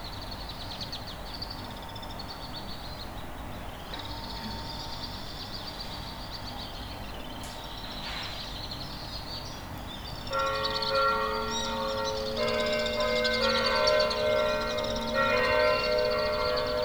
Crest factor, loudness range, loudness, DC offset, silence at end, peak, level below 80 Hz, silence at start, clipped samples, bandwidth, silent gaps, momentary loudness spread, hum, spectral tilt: 20 dB; 12 LU; -30 LUFS; under 0.1%; 0 s; -12 dBFS; -46 dBFS; 0 s; under 0.1%; over 20 kHz; none; 14 LU; none; -3.5 dB/octave